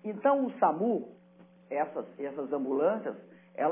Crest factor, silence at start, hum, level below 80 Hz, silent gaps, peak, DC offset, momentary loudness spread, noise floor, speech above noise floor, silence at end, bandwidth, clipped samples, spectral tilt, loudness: 18 dB; 0.05 s; none; under -90 dBFS; none; -14 dBFS; under 0.1%; 13 LU; -58 dBFS; 28 dB; 0 s; 3.6 kHz; under 0.1%; -6.5 dB/octave; -31 LUFS